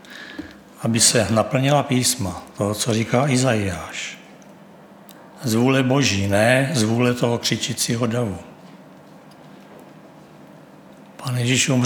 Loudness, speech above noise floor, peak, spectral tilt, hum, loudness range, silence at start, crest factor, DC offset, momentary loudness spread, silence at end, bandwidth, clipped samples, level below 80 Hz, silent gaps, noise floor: -19 LUFS; 26 dB; -2 dBFS; -4 dB/octave; none; 9 LU; 0.05 s; 20 dB; under 0.1%; 16 LU; 0 s; 19.5 kHz; under 0.1%; -56 dBFS; none; -45 dBFS